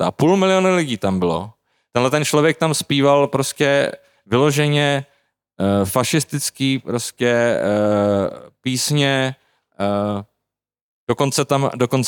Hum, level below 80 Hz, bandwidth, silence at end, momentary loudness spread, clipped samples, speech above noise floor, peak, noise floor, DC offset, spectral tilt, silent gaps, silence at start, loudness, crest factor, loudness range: none; -62 dBFS; 19.5 kHz; 0 s; 9 LU; under 0.1%; 65 dB; -4 dBFS; -83 dBFS; under 0.1%; -5 dB/octave; 10.81-11.07 s; 0 s; -18 LUFS; 16 dB; 4 LU